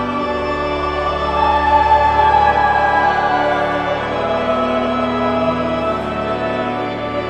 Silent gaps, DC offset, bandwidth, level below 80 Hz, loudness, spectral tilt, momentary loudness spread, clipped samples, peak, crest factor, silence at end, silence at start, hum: none; 0.1%; 8.8 kHz; -34 dBFS; -16 LUFS; -6 dB/octave; 7 LU; under 0.1%; -2 dBFS; 14 dB; 0 s; 0 s; none